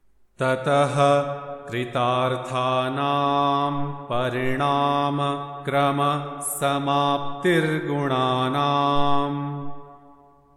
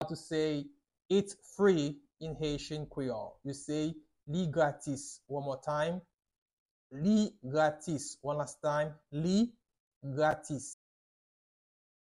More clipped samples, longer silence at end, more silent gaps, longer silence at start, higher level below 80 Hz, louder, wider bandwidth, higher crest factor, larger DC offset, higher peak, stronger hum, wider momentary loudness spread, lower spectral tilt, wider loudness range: neither; second, 0.45 s vs 1.3 s; second, none vs 6.38-6.46 s, 6.53-6.90 s, 9.80-10.01 s; first, 0.4 s vs 0 s; first, -50 dBFS vs -64 dBFS; first, -23 LUFS vs -34 LUFS; first, 15 kHz vs 12 kHz; about the same, 16 dB vs 18 dB; neither; first, -6 dBFS vs -16 dBFS; neither; second, 8 LU vs 13 LU; about the same, -5.5 dB/octave vs -6 dB/octave; about the same, 1 LU vs 3 LU